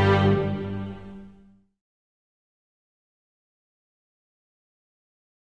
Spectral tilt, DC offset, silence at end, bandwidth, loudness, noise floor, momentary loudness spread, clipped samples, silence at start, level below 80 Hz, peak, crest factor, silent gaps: -8 dB/octave; under 0.1%; 4.15 s; 7.2 kHz; -24 LUFS; -55 dBFS; 23 LU; under 0.1%; 0 s; -54 dBFS; -8 dBFS; 22 dB; none